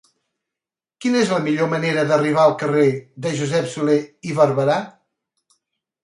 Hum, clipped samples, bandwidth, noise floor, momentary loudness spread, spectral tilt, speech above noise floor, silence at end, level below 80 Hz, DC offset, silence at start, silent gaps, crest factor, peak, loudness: none; under 0.1%; 11.5 kHz; -88 dBFS; 9 LU; -6 dB/octave; 70 dB; 1.15 s; -66 dBFS; under 0.1%; 1 s; none; 18 dB; -2 dBFS; -19 LUFS